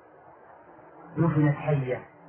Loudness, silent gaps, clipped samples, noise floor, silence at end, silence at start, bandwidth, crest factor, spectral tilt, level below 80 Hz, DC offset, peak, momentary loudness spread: -26 LUFS; none; under 0.1%; -52 dBFS; 0.25 s; 0.95 s; 3.4 kHz; 16 dB; -12.5 dB/octave; -58 dBFS; under 0.1%; -12 dBFS; 10 LU